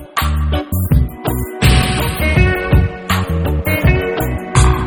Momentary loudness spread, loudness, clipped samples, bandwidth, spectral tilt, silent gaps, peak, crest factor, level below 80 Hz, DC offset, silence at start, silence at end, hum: 6 LU; -15 LUFS; under 0.1%; over 20 kHz; -5.5 dB/octave; none; 0 dBFS; 14 dB; -18 dBFS; under 0.1%; 0 s; 0 s; none